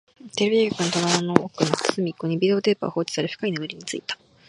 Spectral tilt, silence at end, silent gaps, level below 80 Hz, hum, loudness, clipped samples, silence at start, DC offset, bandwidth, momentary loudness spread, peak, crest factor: -4.5 dB/octave; 0.35 s; none; -64 dBFS; none; -23 LUFS; under 0.1%; 0.25 s; under 0.1%; 11.5 kHz; 10 LU; 0 dBFS; 24 dB